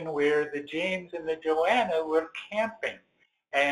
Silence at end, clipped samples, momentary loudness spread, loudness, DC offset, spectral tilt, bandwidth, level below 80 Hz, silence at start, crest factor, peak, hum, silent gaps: 0 s; under 0.1%; 9 LU; -28 LUFS; under 0.1%; -4.5 dB/octave; 11 kHz; -70 dBFS; 0 s; 16 dB; -12 dBFS; none; none